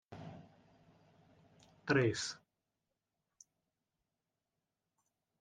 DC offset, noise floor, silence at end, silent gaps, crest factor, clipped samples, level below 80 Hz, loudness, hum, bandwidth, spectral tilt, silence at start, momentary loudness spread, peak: under 0.1%; -90 dBFS; 3.05 s; none; 28 dB; under 0.1%; -76 dBFS; -36 LUFS; none; 10 kHz; -5 dB/octave; 0.1 s; 22 LU; -16 dBFS